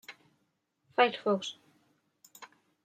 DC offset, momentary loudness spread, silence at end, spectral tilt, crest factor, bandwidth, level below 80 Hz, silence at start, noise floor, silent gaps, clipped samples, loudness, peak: under 0.1%; 25 LU; 0.4 s; -4 dB/octave; 24 dB; 16 kHz; under -90 dBFS; 0.1 s; -78 dBFS; none; under 0.1%; -30 LUFS; -12 dBFS